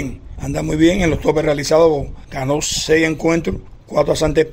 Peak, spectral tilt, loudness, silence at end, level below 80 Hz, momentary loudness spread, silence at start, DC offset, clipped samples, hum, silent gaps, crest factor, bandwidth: 0 dBFS; -5 dB/octave; -17 LUFS; 0 s; -32 dBFS; 12 LU; 0 s; under 0.1%; under 0.1%; none; none; 16 dB; 16 kHz